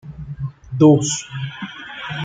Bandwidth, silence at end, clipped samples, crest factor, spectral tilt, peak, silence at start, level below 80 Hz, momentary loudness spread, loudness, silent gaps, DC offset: 9.4 kHz; 0 s; under 0.1%; 18 dB; -5.5 dB/octave; -2 dBFS; 0.05 s; -48 dBFS; 18 LU; -18 LUFS; none; under 0.1%